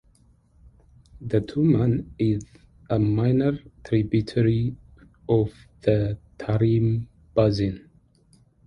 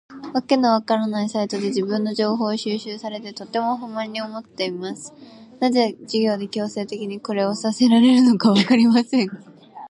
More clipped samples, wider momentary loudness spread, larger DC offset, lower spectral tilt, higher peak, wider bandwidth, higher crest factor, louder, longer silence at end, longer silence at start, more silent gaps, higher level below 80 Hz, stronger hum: neither; second, 9 LU vs 15 LU; neither; first, -9.5 dB/octave vs -5.5 dB/octave; second, -6 dBFS vs -2 dBFS; second, 7.2 kHz vs 11 kHz; about the same, 18 dB vs 18 dB; second, -24 LUFS vs -20 LUFS; first, 0.85 s vs 0 s; first, 1.2 s vs 0.1 s; neither; first, -46 dBFS vs -70 dBFS; neither